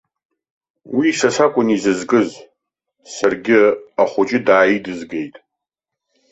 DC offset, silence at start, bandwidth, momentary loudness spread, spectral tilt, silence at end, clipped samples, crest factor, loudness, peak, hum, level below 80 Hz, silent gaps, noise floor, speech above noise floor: under 0.1%; 0.85 s; 8.2 kHz; 13 LU; -4.5 dB/octave; 1 s; under 0.1%; 16 dB; -16 LUFS; -2 dBFS; none; -60 dBFS; none; -83 dBFS; 67 dB